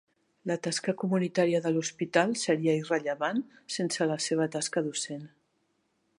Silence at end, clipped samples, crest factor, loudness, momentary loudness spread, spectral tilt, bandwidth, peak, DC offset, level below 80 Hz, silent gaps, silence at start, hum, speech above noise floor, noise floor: 0.9 s; under 0.1%; 22 dB; -29 LUFS; 8 LU; -4.5 dB/octave; 11.5 kHz; -8 dBFS; under 0.1%; -80 dBFS; none; 0.45 s; none; 45 dB; -74 dBFS